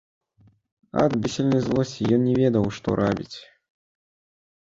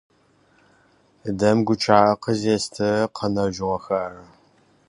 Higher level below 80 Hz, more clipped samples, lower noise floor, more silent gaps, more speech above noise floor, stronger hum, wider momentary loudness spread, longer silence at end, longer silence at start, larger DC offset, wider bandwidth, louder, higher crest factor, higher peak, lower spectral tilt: about the same, -52 dBFS vs -54 dBFS; neither; about the same, -59 dBFS vs -59 dBFS; neither; about the same, 37 dB vs 39 dB; neither; about the same, 10 LU vs 10 LU; first, 1.25 s vs 0.65 s; second, 0.95 s vs 1.25 s; neither; second, 7.8 kHz vs 11 kHz; about the same, -23 LUFS vs -21 LUFS; about the same, 18 dB vs 22 dB; second, -8 dBFS vs 0 dBFS; first, -7 dB/octave vs -5.5 dB/octave